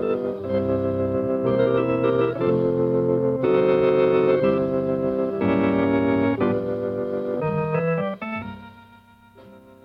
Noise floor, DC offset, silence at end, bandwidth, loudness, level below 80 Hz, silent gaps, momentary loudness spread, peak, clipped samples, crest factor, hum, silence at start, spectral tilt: -51 dBFS; under 0.1%; 0.25 s; 5.4 kHz; -22 LUFS; -52 dBFS; none; 8 LU; -8 dBFS; under 0.1%; 14 dB; none; 0 s; -10 dB/octave